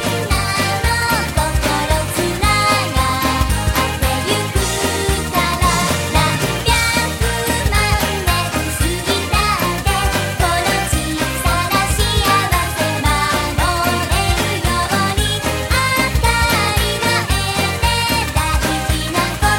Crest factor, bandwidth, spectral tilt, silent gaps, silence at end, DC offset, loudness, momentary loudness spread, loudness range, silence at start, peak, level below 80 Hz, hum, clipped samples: 16 dB; 16.5 kHz; -3.5 dB/octave; none; 0 s; under 0.1%; -16 LUFS; 4 LU; 1 LU; 0 s; 0 dBFS; -24 dBFS; none; under 0.1%